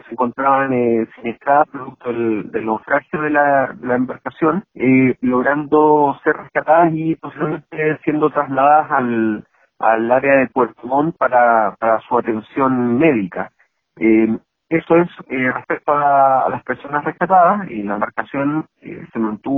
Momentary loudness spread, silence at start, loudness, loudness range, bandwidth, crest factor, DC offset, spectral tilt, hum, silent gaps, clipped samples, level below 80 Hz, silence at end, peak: 10 LU; 0.1 s; -17 LUFS; 3 LU; 3.9 kHz; 16 dB; under 0.1%; -10.5 dB/octave; none; none; under 0.1%; -58 dBFS; 0 s; 0 dBFS